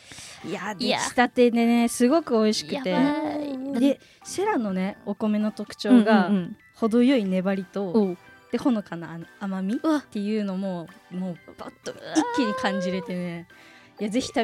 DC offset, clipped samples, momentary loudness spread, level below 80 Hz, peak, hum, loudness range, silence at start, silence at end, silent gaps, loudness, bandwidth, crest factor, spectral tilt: under 0.1%; under 0.1%; 16 LU; -66 dBFS; -4 dBFS; none; 6 LU; 0.1 s; 0 s; none; -24 LUFS; 14.5 kHz; 20 dB; -5.5 dB/octave